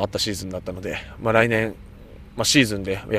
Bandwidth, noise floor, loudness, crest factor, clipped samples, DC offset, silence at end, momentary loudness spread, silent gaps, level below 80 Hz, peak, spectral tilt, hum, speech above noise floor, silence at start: 15.5 kHz; -42 dBFS; -22 LUFS; 22 dB; under 0.1%; under 0.1%; 0 s; 14 LU; none; -44 dBFS; 0 dBFS; -4 dB/octave; none; 20 dB; 0 s